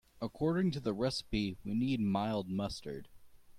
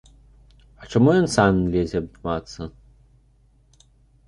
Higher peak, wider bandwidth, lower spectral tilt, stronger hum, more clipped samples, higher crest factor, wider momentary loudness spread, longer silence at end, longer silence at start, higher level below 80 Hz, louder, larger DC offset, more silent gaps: second, -22 dBFS vs -2 dBFS; first, 14.5 kHz vs 11.5 kHz; about the same, -6.5 dB/octave vs -6.5 dB/octave; second, none vs 50 Hz at -45 dBFS; neither; second, 14 dB vs 20 dB; second, 11 LU vs 19 LU; second, 0 s vs 1.6 s; second, 0.2 s vs 0.8 s; second, -56 dBFS vs -44 dBFS; second, -35 LUFS vs -21 LUFS; neither; neither